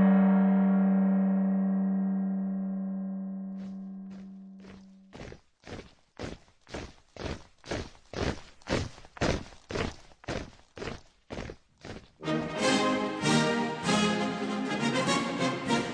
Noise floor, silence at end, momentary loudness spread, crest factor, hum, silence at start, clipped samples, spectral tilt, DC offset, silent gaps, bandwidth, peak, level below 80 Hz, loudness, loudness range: -51 dBFS; 0 s; 21 LU; 18 dB; none; 0 s; under 0.1%; -5.5 dB/octave; under 0.1%; none; 10.5 kHz; -12 dBFS; -50 dBFS; -29 LUFS; 16 LU